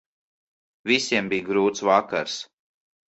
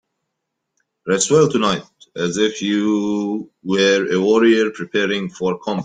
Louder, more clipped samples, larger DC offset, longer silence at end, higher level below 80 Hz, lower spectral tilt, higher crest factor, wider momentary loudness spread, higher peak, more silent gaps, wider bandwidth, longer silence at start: second, -23 LUFS vs -18 LUFS; neither; neither; first, 0.65 s vs 0 s; second, -66 dBFS vs -58 dBFS; about the same, -3.5 dB/octave vs -4.5 dB/octave; first, 22 dB vs 16 dB; about the same, 13 LU vs 11 LU; about the same, -4 dBFS vs -2 dBFS; neither; second, 8.2 kHz vs 9.6 kHz; second, 0.85 s vs 1.05 s